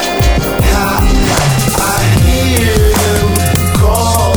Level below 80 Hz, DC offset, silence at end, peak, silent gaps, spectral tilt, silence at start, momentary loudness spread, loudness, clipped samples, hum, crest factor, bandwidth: -16 dBFS; under 0.1%; 0 s; 0 dBFS; none; -4.5 dB/octave; 0 s; 2 LU; -11 LUFS; under 0.1%; none; 10 dB; over 20 kHz